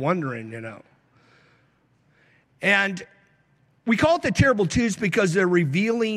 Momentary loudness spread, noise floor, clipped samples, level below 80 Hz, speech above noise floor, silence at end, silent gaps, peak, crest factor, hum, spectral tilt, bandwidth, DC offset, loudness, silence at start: 15 LU; -63 dBFS; under 0.1%; -48 dBFS; 41 dB; 0 s; none; -6 dBFS; 18 dB; none; -5.5 dB/octave; 13.5 kHz; under 0.1%; -22 LUFS; 0 s